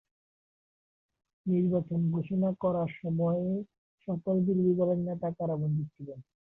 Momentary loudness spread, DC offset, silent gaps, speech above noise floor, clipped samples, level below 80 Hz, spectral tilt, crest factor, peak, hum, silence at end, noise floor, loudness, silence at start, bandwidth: 14 LU; under 0.1%; 3.78-3.98 s; over 61 dB; under 0.1%; -66 dBFS; -12.5 dB/octave; 14 dB; -16 dBFS; none; 0.35 s; under -90 dBFS; -30 LUFS; 1.45 s; 3.5 kHz